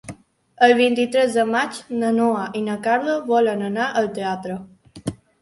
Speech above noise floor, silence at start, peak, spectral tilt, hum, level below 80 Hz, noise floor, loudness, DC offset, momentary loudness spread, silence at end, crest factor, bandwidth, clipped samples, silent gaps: 24 dB; 0.05 s; -2 dBFS; -5 dB/octave; none; -60 dBFS; -43 dBFS; -20 LUFS; under 0.1%; 16 LU; 0.25 s; 18 dB; 11.5 kHz; under 0.1%; none